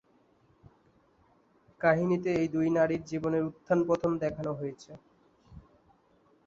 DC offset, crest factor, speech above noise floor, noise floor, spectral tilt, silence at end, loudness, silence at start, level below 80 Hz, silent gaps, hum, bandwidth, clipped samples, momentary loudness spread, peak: under 0.1%; 22 dB; 37 dB; -66 dBFS; -8 dB/octave; 0.9 s; -29 LUFS; 1.8 s; -62 dBFS; none; none; 7.6 kHz; under 0.1%; 10 LU; -10 dBFS